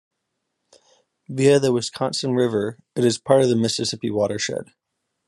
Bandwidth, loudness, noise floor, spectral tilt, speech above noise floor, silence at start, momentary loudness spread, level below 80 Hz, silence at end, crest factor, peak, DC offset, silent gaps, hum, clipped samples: 12 kHz; -21 LUFS; -78 dBFS; -5 dB/octave; 57 dB; 1.3 s; 9 LU; -66 dBFS; 0.65 s; 20 dB; -2 dBFS; under 0.1%; none; none; under 0.1%